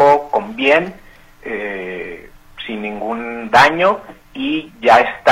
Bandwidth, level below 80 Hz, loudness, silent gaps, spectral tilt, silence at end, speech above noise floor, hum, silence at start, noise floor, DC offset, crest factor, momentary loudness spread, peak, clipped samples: 16 kHz; -48 dBFS; -16 LUFS; none; -4.5 dB/octave; 0 s; 22 dB; none; 0 s; -36 dBFS; under 0.1%; 16 dB; 19 LU; 0 dBFS; under 0.1%